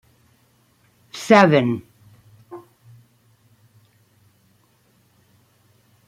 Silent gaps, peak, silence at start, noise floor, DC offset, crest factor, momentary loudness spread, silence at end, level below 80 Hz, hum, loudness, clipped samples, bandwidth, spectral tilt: none; -2 dBFS; 1.15 s; -60 dBFS; under 0.1%; 22 dB; 29 LU; 3.5 s; -68 dBFS; none; -16 LUFS; under 0.1%; 15.5 kHz; -6 dB/octave